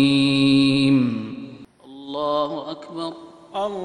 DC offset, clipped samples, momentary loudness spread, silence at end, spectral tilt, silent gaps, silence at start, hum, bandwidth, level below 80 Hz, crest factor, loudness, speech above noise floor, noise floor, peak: under 0.1%; under 0.1%; 20 LU; 0 s; -6 dB/octave; none; 0 s; none; 10.5 kHz; -56 dBFS; 16 dB; -20 LUFS; 23 dB; -42 dBFS; -6 dBFS